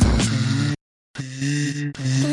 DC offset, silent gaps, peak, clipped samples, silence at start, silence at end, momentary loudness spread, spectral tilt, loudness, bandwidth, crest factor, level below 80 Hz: under 0.1%; 0.81-1.14 s; -6 dBFS; under 0.1%; 0 s; 0 s; 13 LU; -5 dB/octave; -23 LUFS; 11.5 kHz; 16 dB; -30 dBFS